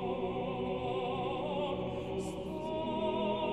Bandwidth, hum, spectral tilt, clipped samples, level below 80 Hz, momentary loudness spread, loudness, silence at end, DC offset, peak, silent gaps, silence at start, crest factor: 12 kHz; none; -6.5 dB/octave; under 0.1%; -56 dBFS; 5 LU; -36 LUFS; 0 s; 0.1%; -22 dBFS; none; 0 s; 14 dB